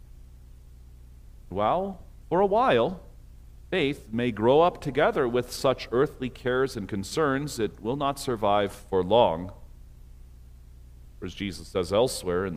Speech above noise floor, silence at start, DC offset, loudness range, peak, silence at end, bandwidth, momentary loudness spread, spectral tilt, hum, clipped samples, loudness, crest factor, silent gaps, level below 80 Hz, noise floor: 22 dB; 0.15 s; under 0.1%; 4 LU; -6 dBFS; 0 s; 15.5 kHz; 13 LU; -5.5 dB/octave; 60 Hz at -50 dBFS; under 0.1%; -26 LUFS; 20 dB; none; -48 dBFS; -48 dBFS